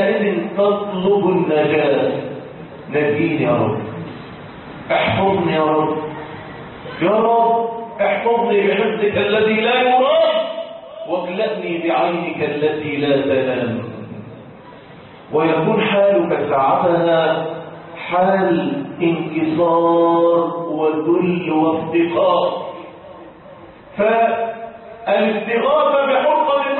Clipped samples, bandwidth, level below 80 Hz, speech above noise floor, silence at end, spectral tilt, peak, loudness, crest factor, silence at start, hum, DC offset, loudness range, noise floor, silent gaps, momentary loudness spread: under 0.1%; 4.3 kHz; -54 dBFS; 23 dB; 0 s; -11 dB/octave; -4 dBFS; -17 LUFS; 14 dB; 0 s; none; under 0.1%; 4 LU; -39 dBFS; none; 17 LU